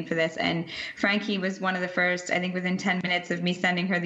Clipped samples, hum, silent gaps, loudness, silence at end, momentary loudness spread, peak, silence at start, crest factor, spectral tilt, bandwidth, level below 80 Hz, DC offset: under 0.1%; none; none; -26 LUFS; 0 s; 4 LU; -8 dBFS; 0 s; 20 dB; -5 dB/octave; 8.2 kHz; -68 dBFS; under 0.1%